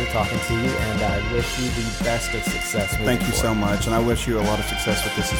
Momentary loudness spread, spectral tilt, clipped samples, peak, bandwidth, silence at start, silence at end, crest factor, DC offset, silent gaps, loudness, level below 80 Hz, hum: 3 LU; -4.5 dB/octave; under 0.1%; -6 dBFS; over 20 kHz; 0 s; 0 s; 16 dB; under 0.1%; none; -22 LUFS; -32 dBFS; none